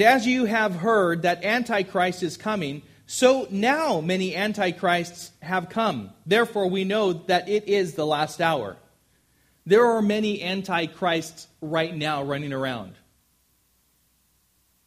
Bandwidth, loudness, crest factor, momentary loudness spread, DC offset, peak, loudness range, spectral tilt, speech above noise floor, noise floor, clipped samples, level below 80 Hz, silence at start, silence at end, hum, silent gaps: 15.5 kHz; -24 LUFS; 20 dB; 10 LU; under 0.1%; -4 dBFS; 5 LU; -5 dB/octave; 43 dB; -66 dBFS; under 0.1%; -64 dBFS; 0 s; 1.95 s; none; none